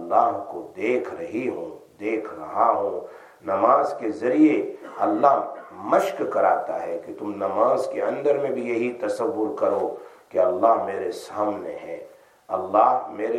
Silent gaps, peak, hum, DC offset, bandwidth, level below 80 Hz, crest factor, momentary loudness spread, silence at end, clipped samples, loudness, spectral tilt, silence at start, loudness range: none; -4 dBFS; none; under 0.1%; 14 kHz; -76 dBFS; 20 dB; 14 LU; 0 s; under 0.1%; -23 LUFS; -6.5 dB/octave; 0 s; 3 LU